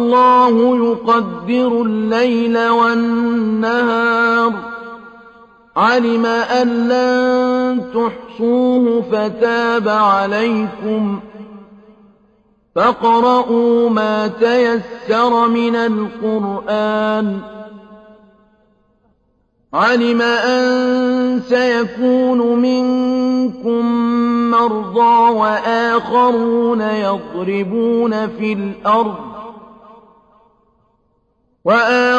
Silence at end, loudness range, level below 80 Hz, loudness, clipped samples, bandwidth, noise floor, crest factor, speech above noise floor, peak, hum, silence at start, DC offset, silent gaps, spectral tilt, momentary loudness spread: 0 s; 6 LU; -56 dBFS; -15 LUFS; under 0.1%; 7.6 kHz; -61 dBFS; 14 dB; 47 dB; -2 dBFS; none; 0 s; under 0.1%; none; -6 dB/octave; 8 LU